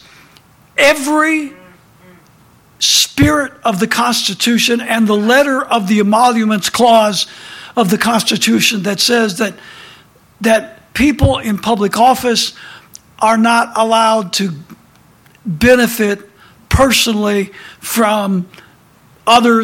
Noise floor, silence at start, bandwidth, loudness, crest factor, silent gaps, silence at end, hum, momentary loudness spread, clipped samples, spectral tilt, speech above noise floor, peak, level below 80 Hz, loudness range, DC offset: -47 dBFS; 0.8 s; 17 kHz; -12 LUFS; 14 dB; none; 0 s; none; 11 LU; under 0.1%; -3.5 dB/octave; 34 dB; 0 dBFS; -36 dBFS; 3 LU; under 0.1%